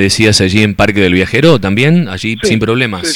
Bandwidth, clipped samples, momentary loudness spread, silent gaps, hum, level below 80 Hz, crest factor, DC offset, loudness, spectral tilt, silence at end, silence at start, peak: 17 kHz; 0.2%; 5 LU; none; none; -36 dBFS; 10 dB; under 0.1%; -10 LUFS; -5 dB/octave; 0 s; 0 s; 0 dBFS